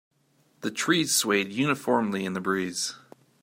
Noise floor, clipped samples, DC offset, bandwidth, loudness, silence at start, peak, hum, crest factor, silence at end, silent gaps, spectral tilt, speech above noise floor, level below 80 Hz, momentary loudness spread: -66 dBFS; under 0.1%; under 0.1%; 16 kHz; -26 LUFS; 0.6 s; -8 dBFS; none; 20 dB; 0.45 s; none; -3 dB/octave; 39 dB; -74 dBFS; 10 LU